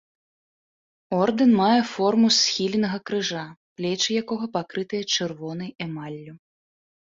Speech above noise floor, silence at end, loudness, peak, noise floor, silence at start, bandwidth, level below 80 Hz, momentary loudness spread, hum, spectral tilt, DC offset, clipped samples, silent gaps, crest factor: over 67 dB; 0.75 s; -23 LUFS; -8 dBFS; under -90 dBFS; 1.1 s; 7.8 kHz; -66 dBFS; 15 LU; none; -4 dB/octave; under 0.1%; under 0.1%; 3.57-3.76 s; 18 dB